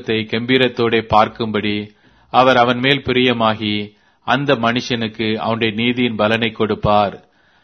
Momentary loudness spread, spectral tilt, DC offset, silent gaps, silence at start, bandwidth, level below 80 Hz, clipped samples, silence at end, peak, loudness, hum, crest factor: 8 LU; -6 dB/octave; under 0.1%; none; 0 s; 6.6 kHz; -46 dBFS; under 0.1%; 0.45 s; 0 dBFS; -16 LUFS; none; 16 dB